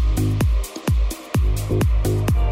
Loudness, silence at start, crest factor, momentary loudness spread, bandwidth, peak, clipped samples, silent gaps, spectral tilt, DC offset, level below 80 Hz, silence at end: -21 LUFS; 0 s; 10 dB; 3 LU; 16 kHz; -8 dBFS; under 0.1%; none; -6.5 dB/octave; under 0.1%; -22 dBFS; 0 s